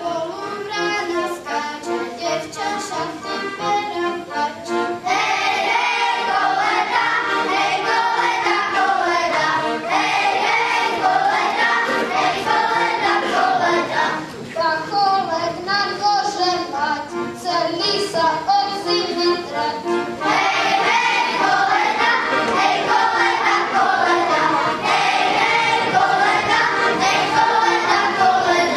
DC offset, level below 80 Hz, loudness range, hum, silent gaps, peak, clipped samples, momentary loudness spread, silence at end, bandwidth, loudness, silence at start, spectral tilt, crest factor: under 0.1%; -58 dBFS; 5 LU; none; none; -2 dBFS; under 0.1%; 8 LU; 0 s; 13.5 kHz; -18 LUFS; 0 s; -2.5 dB/octave; 16 dB